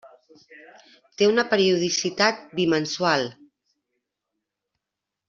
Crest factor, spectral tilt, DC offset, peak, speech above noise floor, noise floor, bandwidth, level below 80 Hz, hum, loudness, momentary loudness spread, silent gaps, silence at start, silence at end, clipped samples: 22 dB; -3.5 dB/octave; under 0.1%; -4 dBFS; 62 dB; -86 dBFS; 7.6 kHz; -68 dBFS; none; -22 LUFS; 5 LU; none; 0.05 s; 1.95 s; under 0.1%